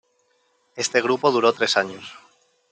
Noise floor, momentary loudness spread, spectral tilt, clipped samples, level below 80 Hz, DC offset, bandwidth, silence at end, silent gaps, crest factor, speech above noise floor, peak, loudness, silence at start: -66 dBFS; 21 LU; -2.5 dB/octave; under 0.1%; -74 dBFS; under 0.1%; 9.4 kHz; 0.6 s; none; 20 dB; 45 dB; -4 dBFS; -21 LUFS; 0.75 s